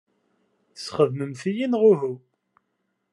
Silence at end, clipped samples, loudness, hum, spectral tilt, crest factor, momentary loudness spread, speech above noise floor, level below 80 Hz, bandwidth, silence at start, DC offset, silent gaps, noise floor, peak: 0.95 s; under 0.1%; -23 LUFS; none; -7 dB/octave; 20 dB; 16 LU; 53 dB; -76 dBFS; 10.5 kHz; 0.75 s; under 0.1%; none; -75 dBFS; -6 dBFS